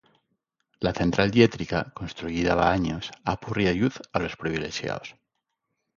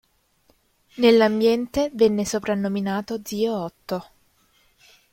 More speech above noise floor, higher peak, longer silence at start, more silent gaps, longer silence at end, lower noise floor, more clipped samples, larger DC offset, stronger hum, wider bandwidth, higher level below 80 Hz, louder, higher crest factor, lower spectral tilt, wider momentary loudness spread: first, 55 dB vs 42 dB; about the same, -4 dBFS vs -4 dBFS; second, 0.8 s vs 0.95 s; neither; second, 0.85 s vs 1.1 s; first, -80 dBFS vs -63 dBFS; neither; neither; neither; second, 7.4 kHz vs 16.5 kHz; first, -46 dBFS vs -56 dBFS; second, -26 LUFS vs -22 LUFS; first, 24 dB vs 18 dB; about the same, -6 dB/octave vs -5 dB/octave; second, 11 LU vs 14 LU